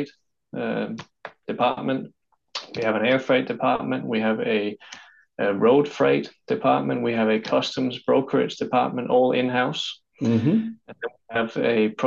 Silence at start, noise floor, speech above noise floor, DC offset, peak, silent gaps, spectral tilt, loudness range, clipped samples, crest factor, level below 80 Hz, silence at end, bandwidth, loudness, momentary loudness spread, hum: 0 s; -49 dBFS; 26 dB; under 0.1%; -8 dBFS; none; -6 dB/octave; 3 LU; under 0.1%; 16 dB; -68 dBFS; 0 s; 7.6 kHz; -23 LUFS; 15 LU; none